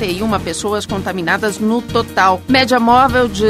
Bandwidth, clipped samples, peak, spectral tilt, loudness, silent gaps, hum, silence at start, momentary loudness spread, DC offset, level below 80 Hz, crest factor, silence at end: 16 kHz; under 0.1%; 0 dBFS; -4.5 dB/octave; -14 LUFS; none; none; 0 s; 8 LU; under 0.1%; -36 dBFS; 14 dB; 0 s